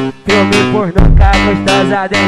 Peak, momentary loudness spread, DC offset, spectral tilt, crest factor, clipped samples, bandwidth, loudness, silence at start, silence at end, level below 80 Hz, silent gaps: 0 dBFS; 3 LU; under 0.1%; -5.5 dB/octave; 10 dB; 2%; 12 kHz; -10 LUFS; 0 s; 0 s; -14 dBFS; none